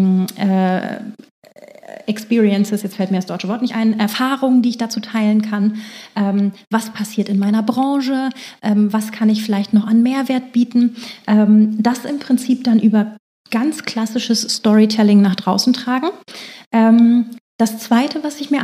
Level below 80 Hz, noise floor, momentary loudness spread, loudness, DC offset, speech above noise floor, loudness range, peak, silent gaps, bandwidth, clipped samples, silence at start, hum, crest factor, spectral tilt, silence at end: -74 dBFS; -40 dBFS; 11 LU; -16 LUFS; under 0.1%; 24 dB; 4 LU; 0 dBFS; 1.31-1.42 s, 13.19-13.45 s, 16.66-16.71 s, 17.41-17.59 s; 15.5 kHz; under 0.1%; 0 s; none; 14 dB; -5.5 dB/octave; 0 s